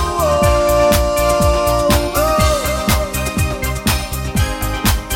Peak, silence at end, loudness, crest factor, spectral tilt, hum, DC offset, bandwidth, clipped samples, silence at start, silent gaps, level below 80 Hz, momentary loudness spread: 0 dBFS; 0 s; -15 LUFS; 14 dB; -4.5 dB/octave; none; under 0.1%; 17 kHz; under 0.1%; 0 s; none; -22 dBFS; 6 LU